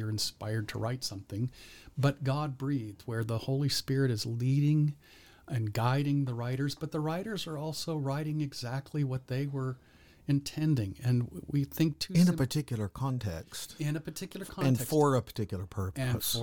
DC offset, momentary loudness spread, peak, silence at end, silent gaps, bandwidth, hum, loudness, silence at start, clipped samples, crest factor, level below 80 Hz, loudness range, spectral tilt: under 0.1%; 10 LU; -14 dBFS; 0 s; none; 19 kHz; none; -32 LUFS; 0 s; under 0.1%; 18 dB; -58 dBFS; 4 LU; -6 dB/octave